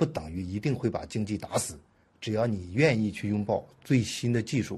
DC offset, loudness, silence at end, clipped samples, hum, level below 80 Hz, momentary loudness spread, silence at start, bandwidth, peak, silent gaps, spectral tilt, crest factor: under 0.1%; -29 LUFS; 0 s; under 0.1%; none; -56 dBFS; 10 LU; 0 s; 13 kHz; -8 dBFS; none; -6 dB/octave; 20 dB